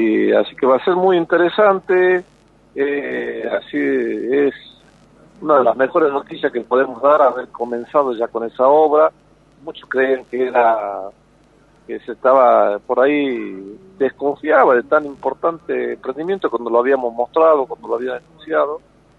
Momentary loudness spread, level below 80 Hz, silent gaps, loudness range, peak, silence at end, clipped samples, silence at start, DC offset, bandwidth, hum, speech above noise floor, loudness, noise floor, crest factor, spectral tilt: 13 LU; -60 dBFS; none; 3 LU; 0 dBFS; 0.4 s; under 0.1%; 0 s; under 0.1%; 5.6 kHz; none; 35 dB; -17 LUFS; -52 dBFS; 16 dB; -7.5 dB/octave